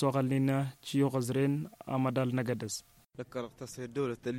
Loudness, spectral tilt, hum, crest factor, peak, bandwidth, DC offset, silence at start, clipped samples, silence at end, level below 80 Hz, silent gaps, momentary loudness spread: -33 LUFS; -6.5 dB/octave; none; 16 dB; -16 dBFS; 16 kHz; under 0.1%; 0 s; under 0.1%; 0 s; -68 dBFS; none; 13 LU